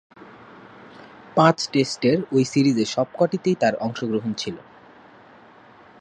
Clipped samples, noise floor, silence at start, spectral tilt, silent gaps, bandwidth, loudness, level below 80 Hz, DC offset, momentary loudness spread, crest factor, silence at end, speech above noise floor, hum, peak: under 0.1%; -49 dBFS; 0.2 s; -5.5 dB/octave; none; 9.8 kHz; -21 LUFS; -64 dBFS; under 0.1%; 10 LU; 22 dB; 1.4 s; 28 dB; none; -2 dBFS